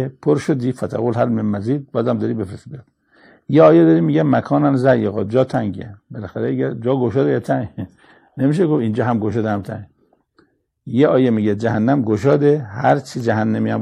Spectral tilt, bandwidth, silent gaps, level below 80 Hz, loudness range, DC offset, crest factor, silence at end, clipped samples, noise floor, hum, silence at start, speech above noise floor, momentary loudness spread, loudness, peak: -8.5 dB/octave; 11 kHz; none; -56 dBFS; 6 LU; under 0.1%; 16 dB; 0 s; under 0.1%; -58 dBFS; none; 0 s; 42 dB; 15 LU; -17 LUFS; 0 dBFS